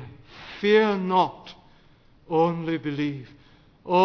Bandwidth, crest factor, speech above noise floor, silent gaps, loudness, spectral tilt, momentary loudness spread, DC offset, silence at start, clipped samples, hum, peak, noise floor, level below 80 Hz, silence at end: 5.4 kHz; 18 dB; 32 dB; none; -24 LUFS; -7 dB/octave; 24 LU; under 0.1%; 0 s; under 0.1%; none; -8 dBFS; -55 dBFS; -60 dBFS; 0 s